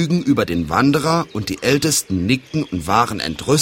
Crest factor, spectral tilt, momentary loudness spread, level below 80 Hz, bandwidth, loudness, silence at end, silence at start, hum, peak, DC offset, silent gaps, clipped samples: 18 dB; -4.5 dB/octave; 7 LU; -44 dBFS; 16.5 kHz; -18 LUFS; 0 s; 0 s; none; 0 dBFS; under 0.1%; none; under 0.1%